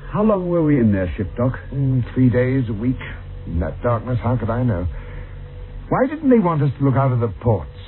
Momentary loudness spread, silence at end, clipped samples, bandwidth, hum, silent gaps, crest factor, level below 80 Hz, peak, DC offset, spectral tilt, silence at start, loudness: 17 LU; 0 s; under 0.1%; 4.2 kHz; none; none; 16 dB; -34 dBFS; -4 dBFS; under 0.1%; -13 dB/octave; 0 s; -19 LUFS